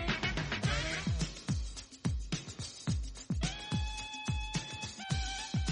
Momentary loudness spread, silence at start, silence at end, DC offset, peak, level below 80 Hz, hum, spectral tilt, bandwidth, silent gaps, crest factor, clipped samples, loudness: 7 LU; 0 s; 0 s; under 0.1%; -20 dBFS; -42 dBFS; none; -4 dB/octave; 11 kHz; none; 16 dB; under 0.1%; -37 LUFS